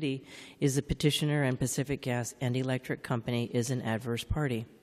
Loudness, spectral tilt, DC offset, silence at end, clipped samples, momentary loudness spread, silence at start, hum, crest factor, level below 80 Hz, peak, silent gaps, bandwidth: -32 LUFS; -5 dB/octave; under 0.1%; 0.15 s; under 0.1%; 6 LU; 0 s; none; 18 dB; -50 dBFS; -14 dBFS; none; 14 kHz